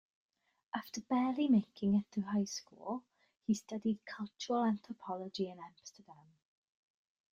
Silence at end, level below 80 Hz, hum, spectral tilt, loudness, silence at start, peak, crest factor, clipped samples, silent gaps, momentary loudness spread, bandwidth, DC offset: 1.2 s; -76 dBFS; none; -5.5 dB/octave; -37 LUFS; 0.75 s; -20 dBFS; 18 dB; under 0.1%; none; 14 LU; 15.5 kHz; under 0.1%